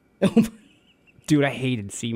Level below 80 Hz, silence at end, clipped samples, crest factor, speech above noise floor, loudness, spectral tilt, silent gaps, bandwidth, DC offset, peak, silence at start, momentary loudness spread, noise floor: -56 dBFS; 0 s; under 0.1%; 18 dB; 36 dB; -23 LUFS; -6 dB/octave; none; 16 kHz; under 0.1%; -6 dBFS; 0.2 s; 8 LU; -58 dBFS